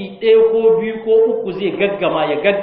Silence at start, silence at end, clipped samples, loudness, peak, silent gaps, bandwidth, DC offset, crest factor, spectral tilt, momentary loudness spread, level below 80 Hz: 0 s; 0 s; under 0.1%; -15 LUFS; -2 dBFS; none; 4.4 kHz; under 0.1%; 14 dB; -3.5 dB/octave; 6 LU; -54 dBFS